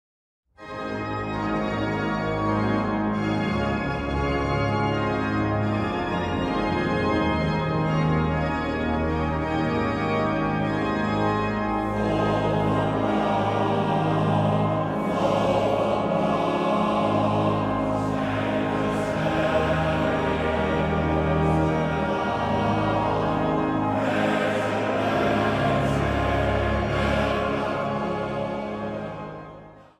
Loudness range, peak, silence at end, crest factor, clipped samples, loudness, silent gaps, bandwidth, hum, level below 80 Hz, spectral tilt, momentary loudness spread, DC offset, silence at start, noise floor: 2 LU; -10 dBFS; 0.15 s; 14 dB; under 0.1%; -24 LUFS; none; 12 kHz; none; -40 dBFS; -7.5 dB/octave; 4 LU; under 0.1%; 0.6 s; -45 dBFS